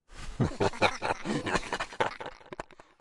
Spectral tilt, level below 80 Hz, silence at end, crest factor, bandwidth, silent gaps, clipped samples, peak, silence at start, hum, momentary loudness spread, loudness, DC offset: -5 dB/octave; -48 dBFS; 0.25 s; 22 dB; 11.5 kHz; none; under 0.1%; -10 dBFS; 0.1 s; none; 17 LU; -31 LUFS; under 0.1%